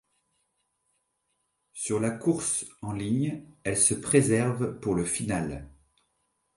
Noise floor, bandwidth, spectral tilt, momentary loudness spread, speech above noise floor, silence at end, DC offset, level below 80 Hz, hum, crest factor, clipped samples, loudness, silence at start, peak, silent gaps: -77 dBFS; 11.5 kHz; -5 dB/octave; 13 LU; 50 dB; 0.9 s; under 0.1%; -54 dBFS; none; 22 dB; under 0.1%; -27 LUFS; 1.75 s; -8 dBFS; none